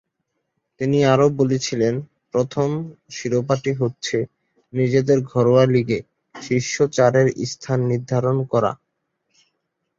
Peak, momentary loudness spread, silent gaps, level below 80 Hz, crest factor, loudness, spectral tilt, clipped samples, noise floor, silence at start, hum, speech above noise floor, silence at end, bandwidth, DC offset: -2 dBFS; 12 LU; none; -58 dBFS; 18 dB; -20 LUFS; -6 dB/octave; under 0.1%; -75 dBFS; 0.8 s; none; 56 dB; 1.25 s; 7.8 kHz; under 0.1%